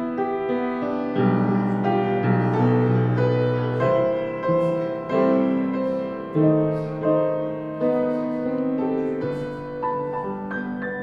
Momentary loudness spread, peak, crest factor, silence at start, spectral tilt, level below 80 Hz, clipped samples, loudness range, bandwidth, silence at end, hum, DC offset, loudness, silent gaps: 8 LU; -6 dBFS; 16 dB; 0 s; -10 dB/octave; -56 dBFS; under 0.1%; 4 LU; 5.8 kHz; 0 s; none; under 0.1%; -23 LUFS; none